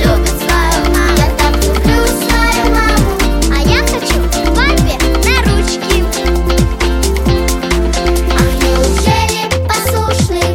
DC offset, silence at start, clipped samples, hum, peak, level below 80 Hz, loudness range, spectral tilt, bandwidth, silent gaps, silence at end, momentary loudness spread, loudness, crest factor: under 0.1%; 0 s; under 0.1%; none; 0 dBFS; -14 dBFS; 1 LU; -4.5 dB/octave; 17 kHz; none; 0 s; 3 LU; -12 LUFS; 10 dB